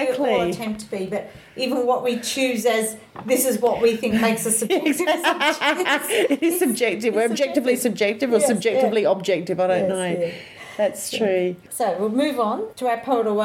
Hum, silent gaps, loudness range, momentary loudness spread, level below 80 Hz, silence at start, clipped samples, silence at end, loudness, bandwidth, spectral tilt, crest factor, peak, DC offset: none; none; 3 LU; 8 LU; -60 dBFS; 0 s; under 0.1%; 0 s; -21 LUFS; 17 kHz; -3.5 dB/octave; 16 dB; -6 dBFS; under 0.1%